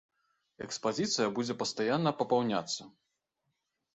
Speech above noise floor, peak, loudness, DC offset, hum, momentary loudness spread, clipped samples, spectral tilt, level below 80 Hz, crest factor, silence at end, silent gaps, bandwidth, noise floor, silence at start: 51 dB; -14 dBFS; -32 LUFS; under 0.1%; none; 9 LU; under 0.1%; -4 dB/octave; -74 dBFS; 20 dB; 1.05 s; none; 8.4 kHz; -83 dBFS; 0.6 s